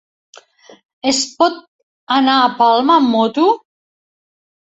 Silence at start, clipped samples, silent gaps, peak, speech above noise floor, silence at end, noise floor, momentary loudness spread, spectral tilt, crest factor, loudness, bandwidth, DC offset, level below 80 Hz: 1.05 s; under 0.1%; 1.68-2.07 s; 0 dBFS; 30 dB; 1.1 s; -44 dBFS; 8 LU; -2.5 dB/octave; 16 dB; -14 LUFS; 8.4 kHz; under 0.1%; -62 dBFS